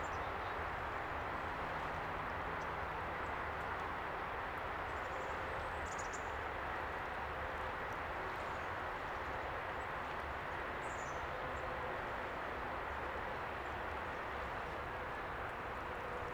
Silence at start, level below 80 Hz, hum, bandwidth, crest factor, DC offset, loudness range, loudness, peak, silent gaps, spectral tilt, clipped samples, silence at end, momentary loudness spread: 0 s; -54 dBFS; none; over 20 kHz; 12 dB; under 0.1%; 1 LU; -42 LUFS; -30 dBFS; none; -5 dB/octave; under 0.1%; 0 s; 1 LU